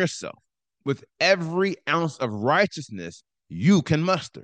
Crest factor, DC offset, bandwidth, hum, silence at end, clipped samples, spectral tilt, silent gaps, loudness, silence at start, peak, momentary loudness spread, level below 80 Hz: 18 dB; under 0.1%; 9.2 kHz; none; 0 s; under 0.1%; -5.5 dB/octave; none; -23 LUFS; 0 s; -6 dBFS; 16 LU; -66 dBFS